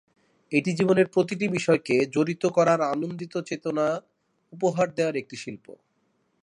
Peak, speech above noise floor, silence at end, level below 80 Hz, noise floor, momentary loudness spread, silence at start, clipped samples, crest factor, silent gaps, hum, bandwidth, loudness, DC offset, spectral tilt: -8 dBFS; 46 dB; 0.7 s; -72 dBFS; -71 dBFS; 11 LU; 0.5 s; under 0.1%; 18 dB; none; none; 11 kHz; -25 LUFS; under 0.1%; -6 dB/octave